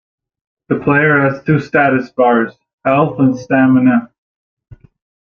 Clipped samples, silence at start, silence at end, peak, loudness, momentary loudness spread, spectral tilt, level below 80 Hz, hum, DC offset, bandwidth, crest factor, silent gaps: under 0.1%; 0.7 s; 0.45 s; 0 dBFS; -13 LUFS; 8 LU; -8.5 dB/octave; -52 dBFS; none; under 0.1%; 6.6 kHz; 14 dB; 2.73-2.78 s, 4.18-4.57 s